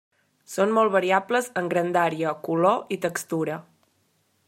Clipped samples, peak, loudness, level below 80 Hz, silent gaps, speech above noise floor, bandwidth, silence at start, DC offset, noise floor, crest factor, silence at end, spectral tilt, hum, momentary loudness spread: under 0.1%; -6 dBFS; -24 LUFS; -76 dBFS; none; 45 dB; 16 kHz; 0.5 s; under 0.1%; -68 dBFS; 20 dB; 0.85 s; -5 dB/octave; none; 8 LU